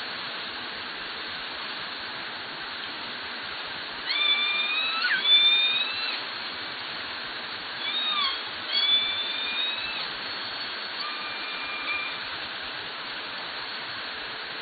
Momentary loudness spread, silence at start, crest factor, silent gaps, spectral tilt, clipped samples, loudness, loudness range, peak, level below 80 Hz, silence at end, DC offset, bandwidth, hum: 12 LU; 0 s; 20 dB; none; -5 dB/octave; under 0.1%; -27 LUFS; 10 LU; -10 dBFS; -68 dBFS; 0 s; under 0.1%; 4.9 kHz; none